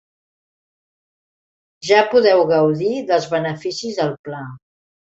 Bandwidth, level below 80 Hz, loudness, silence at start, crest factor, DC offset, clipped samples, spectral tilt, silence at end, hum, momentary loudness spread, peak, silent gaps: 8 kHz; -62 dBFS; -17 LUFS; 1.85 s; 18 dB; under 0.1%; under 0.1%; -5 dB/octave; 0.5 s; none; 17 LU; -2 dBFS; 4.19-4.24 s